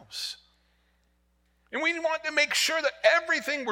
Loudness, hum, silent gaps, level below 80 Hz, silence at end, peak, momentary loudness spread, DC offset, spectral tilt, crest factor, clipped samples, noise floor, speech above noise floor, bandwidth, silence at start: -26 LUFS; none; none; -70 dBFS; 0 s; -8 dBFS; 13 LU; under 0.1%; 0 dB/octave; 22 dB; under 0.1%; -69 dBFS; 42 dB; 17.5 kHz; 0.1 s